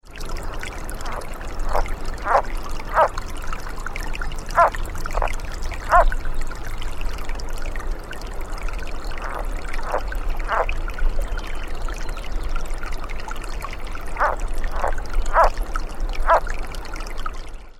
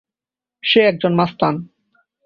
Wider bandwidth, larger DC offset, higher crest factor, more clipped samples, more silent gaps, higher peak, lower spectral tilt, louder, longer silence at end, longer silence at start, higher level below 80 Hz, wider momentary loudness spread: first, 13.5 kHz vs 6.6 kHz; neither; about the same, 20 dB vs 18 dB; neither; neither; about the same, 0 dBFS vs -2 dBFS; second, -4.5 dB/octave vs -8 dB/octave; second, -26 LUFS vs -16 LUFS; second, 0 s vs 0.6 s; second, 0.05 s vs 0.65 s; first, -24 dBFS vs -58 dBFS; first, 14 LU vs 10 LU